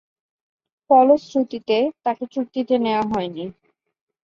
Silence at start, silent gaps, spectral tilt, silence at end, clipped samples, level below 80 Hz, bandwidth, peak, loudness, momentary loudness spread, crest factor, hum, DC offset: 0.9 s; none; -6.5 dB/octave; 0.75 s; under 0.1%; -62 dBFS; 7.2 kHz; -2 dBFS; -20 LUFS; 12 LU; 18 dB; none; under 0.1%